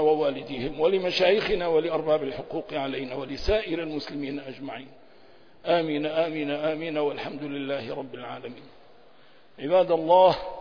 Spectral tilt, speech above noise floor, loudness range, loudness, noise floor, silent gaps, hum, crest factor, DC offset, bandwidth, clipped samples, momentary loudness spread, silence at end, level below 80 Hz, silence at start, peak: -6 dB/octave; 31 dB; 6 LU; -26 LUFS; -57 dBFS; none; none; 18 dB; 0.3%; 5.4 kHz; under 0.1%; 16 LU; 0 s; -48 dBFS; 0 s; -8 dBFS